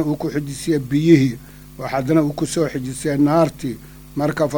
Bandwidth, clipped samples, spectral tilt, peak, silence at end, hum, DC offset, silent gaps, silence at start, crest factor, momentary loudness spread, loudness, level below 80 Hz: over 20 kHz; under 0.1%; -6.5 dB/octave; 0 dBFS; 0 s; none; under 0.1%; none; 0 s; 18 dB; 15 LU; -19 LUFS; -46 dBFS